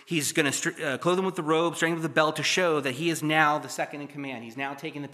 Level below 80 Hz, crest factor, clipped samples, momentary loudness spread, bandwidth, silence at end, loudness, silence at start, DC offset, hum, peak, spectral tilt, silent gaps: -82 dBFS; 22 dB; under 0.1%; 12 LU; 15 kHz; 0 s; -26 LUFS; 0.1 s; under 0.1%; none; -6 dBFS; -3.5 dB/octave; none